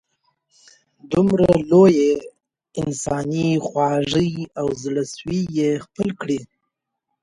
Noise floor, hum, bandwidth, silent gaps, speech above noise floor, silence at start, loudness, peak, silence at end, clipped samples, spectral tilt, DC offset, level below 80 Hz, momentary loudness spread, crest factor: -78 dBFS; none; 11.5 kHz; none; 59 dB; 1.1 s; -20 LUFS; -2 dBFS; 0.75 s; under 0.1%; -6.5 dB/octave; under 0.1%; -50 dBFS; 12 LU; 18 dB